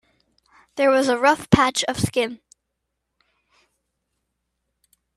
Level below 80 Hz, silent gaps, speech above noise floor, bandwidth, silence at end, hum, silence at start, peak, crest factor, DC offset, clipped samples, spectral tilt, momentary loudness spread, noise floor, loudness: -50 dBFS; none; 60 dB; 14.5 kHz; 2.8 s; none; 0.75 s; 0 dBFS; 24 dB; under 0.1%; under 0.1%; -4.5 dB/octave; 8 LU; -79 dBFS; -19 LUFS